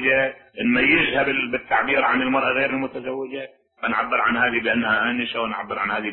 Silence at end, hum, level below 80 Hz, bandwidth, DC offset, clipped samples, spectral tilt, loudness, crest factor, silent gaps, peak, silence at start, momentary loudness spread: 0 s; none; -54 dBFS; 4.2 kHz; under 0.1%; under 0.1%; -9 dB/octave; -21 LUFS; 16 dB; none; -6 dBFS; 0 s; 12 LU